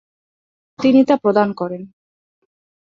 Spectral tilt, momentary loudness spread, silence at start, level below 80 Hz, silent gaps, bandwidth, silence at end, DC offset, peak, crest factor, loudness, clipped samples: -7.5 dB/octave; 13 LU; 0.8 s; -64 dBFS; none; 7.2 kHz; 1.1 s; under 0.1%; -2 dBFS; 16 dB; -16 LUFS; under 0.1%